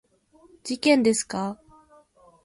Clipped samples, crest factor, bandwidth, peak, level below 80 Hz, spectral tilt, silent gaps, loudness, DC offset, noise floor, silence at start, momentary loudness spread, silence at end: under 0.1%; 20 dB; 11.5 kHz; -6 dBFS; -66 dBFS; -3.5 dB/octave; none; -23 LUFS; under 0.1%; -58 dBFS; 0.65 s; 19 LU; 0.9 s